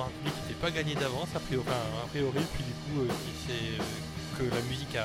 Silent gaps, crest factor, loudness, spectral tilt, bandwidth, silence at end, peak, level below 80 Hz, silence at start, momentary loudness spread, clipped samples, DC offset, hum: none; 16 dB; -33 LUFS; -5 dB/octave; 16.5 kHz; 0 s; -16 dBFS; -50 dBFS; 0 s; 4 LU; under 0.1%; under 0.1%; none